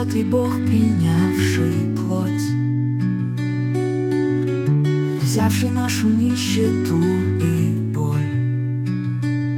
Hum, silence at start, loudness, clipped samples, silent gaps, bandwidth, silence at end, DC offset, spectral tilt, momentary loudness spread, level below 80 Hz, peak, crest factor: none; 0 s; -20 LUFS; under 0.1%; none; 18 kHz; 0 s; under 0.1%; -6.5 dB/octave; 4 LU; -58 dBFS; -4 dBFS; 14 dB